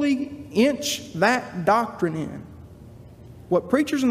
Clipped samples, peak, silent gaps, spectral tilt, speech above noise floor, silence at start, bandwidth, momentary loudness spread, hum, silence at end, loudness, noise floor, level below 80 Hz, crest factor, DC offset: under 0.1%; -6 dBFS; none; -4.5 dB/octave; 22 dB; 0 s; 15.5 kHz; 10 LU; none; 0 s; -23 LUFS; -44 dBFS; -58 dBFS; 18 dB; under 0.1%